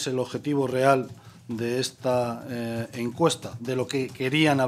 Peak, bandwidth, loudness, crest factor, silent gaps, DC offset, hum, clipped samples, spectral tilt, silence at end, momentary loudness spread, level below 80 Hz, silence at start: -4 dBFS; 15 kHz; -26 LUFS; 22 dB; none; under 0.1%; none; under 0.1%; -5 dB/octave; 0 s; 10 LU; -66 dBFS; 0 s